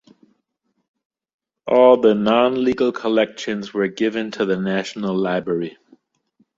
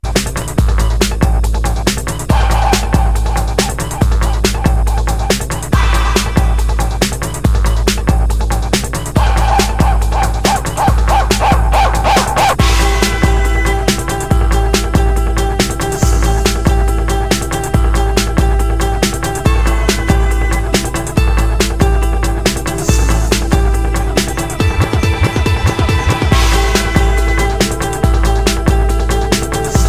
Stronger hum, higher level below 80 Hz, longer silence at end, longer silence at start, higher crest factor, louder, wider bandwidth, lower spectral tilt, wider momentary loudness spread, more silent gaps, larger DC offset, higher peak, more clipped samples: neither; second, -60 dBFS vs -14 dBFS; first, 0.85 s vs 0 s; first, 1.65 s vs 0.05 s; first, 18 dB vs 12 dB; second, -19 LUFS vs -14 LUFS; second, 7.6 kHz vs 16 kHz; first, -6 dB/octave vs -4.5 dB/octave; first, 12 LU vs 4 LU; neither; neither; about the same, -2 dBFS vs 0 dBFS; neither